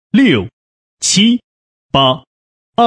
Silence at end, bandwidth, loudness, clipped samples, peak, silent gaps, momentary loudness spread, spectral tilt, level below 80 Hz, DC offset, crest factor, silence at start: 0 s; 10.5 kHz; -13 LUFS; under 0.1%; 0 dBFS; 0.53-0.97 s, 1.44-1.89 s, 2.27-2.73 s; 12 LU; -3.5 dB/octave; -46 dBFS; under 0.1%; 14 dB; 0.15 s